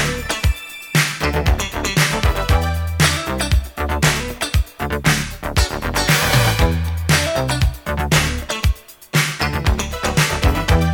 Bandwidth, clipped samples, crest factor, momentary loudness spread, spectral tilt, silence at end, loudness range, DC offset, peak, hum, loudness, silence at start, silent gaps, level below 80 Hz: over 20 kHz; under 0.1%; 18 dB; 5 LU; -4 dB/octave; 0 s; 2 LU; under 0.1%; 0 dBFS; none; -18 LUFS; 0 s; none; -24 dBFS